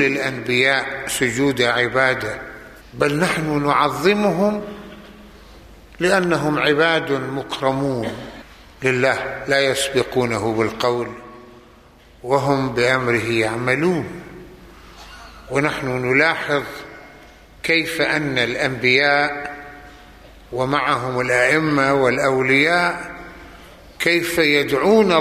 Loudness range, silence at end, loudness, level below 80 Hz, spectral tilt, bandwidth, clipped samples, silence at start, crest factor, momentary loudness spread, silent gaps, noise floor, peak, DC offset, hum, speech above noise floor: 4 LU; 0 s; -18 LUFS; -48 dBFS; -4.5 dB/octave; 15 kHz; under 0.1%; 0 s; 18 dB; 18 LU; none; -47 dBFS; -2 dBFS; under 0.1%; none; 29 dB